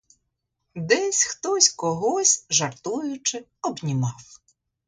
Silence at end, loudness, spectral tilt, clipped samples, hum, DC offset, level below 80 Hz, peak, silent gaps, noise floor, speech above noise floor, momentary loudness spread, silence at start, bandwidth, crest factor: 0.5 s; -22 LUFS; -2.5 dB/octave; under 0.1%; none; under 0.1%; -66 dBFS; -4 dBFS; none; -78 dBFS; 54 dB; 12 LU; 0.75 s; 11 kHz; 22 dB